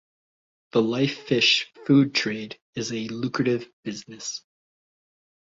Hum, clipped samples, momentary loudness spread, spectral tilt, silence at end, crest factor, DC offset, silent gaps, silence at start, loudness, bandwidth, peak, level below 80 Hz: none; under 0.1%; 16 LU; -4.5 dB/octave; 1.05 s; 18 dB; under 0.1%; 2.61-2.73 s, 3.73-3.83 s; 0.75 s; -24 LUFS; 7.8 kHz; -8 dBFS; -66 dBFS